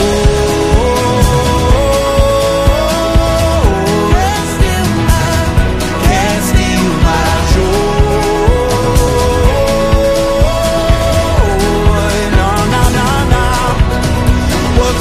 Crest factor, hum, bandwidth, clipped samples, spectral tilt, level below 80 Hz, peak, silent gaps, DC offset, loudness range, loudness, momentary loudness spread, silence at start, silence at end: 10 dB; none; 15.5 kHz; under 0.1%; -5.5 dB/octave; -14 dBFS; 0 dBFS; none; under 0.1%; 1 LU; -11 LUFS; 2 LU; 0 s; 0 s